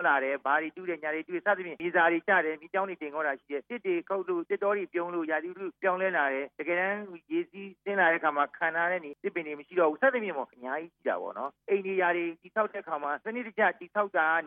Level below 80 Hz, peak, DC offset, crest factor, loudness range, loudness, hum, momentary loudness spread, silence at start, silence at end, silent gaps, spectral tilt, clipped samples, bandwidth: -84 dBFS; -12 dBFS; under 0.1%; 18 dB; 3 LU; -30 LUFS; none; 10 LU; 0 s; 0 s; none; -8.5 dB/octave; under 0.1%; 3.8 kHz